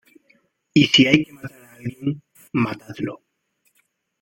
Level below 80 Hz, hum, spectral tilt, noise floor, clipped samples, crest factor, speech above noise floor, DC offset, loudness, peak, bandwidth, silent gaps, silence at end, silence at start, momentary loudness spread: -58 dBFS; none; -5 dB/octave; -69 dBFS; under 0.1%; 22 dB; 49 dB; under 0.1%; -20 LUFS; 0 dBFS; 16.5 kHz; none; 1.05 s; 0.75 s; 20 LU